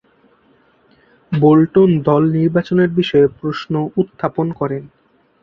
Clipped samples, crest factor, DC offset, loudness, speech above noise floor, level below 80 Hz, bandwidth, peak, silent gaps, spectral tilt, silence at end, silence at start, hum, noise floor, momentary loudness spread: under 0.1%; 14 dB; under 0.1%; -15 LUFS; 40 dB; -52 dBFS; 6.4 kHz; -2 dBFS; none; -9.5 dB/octave; 0.55 s; 1.3 s; none; -54 dBFS; 11 LU